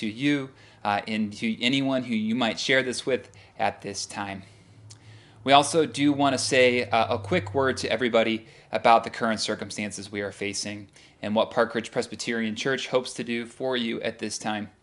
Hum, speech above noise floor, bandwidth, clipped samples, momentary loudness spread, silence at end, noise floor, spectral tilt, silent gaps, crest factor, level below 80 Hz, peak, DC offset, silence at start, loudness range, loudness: none; 24 dB; 11.5 kHz; under 0.1%; 12 LU; 0.15 s; -50 dBFS; -4 dB/octave; none; 24 dB; -68 dBFS; -2 dBFS; under 0.1%; 0 s; 6 LU; -25 LUFS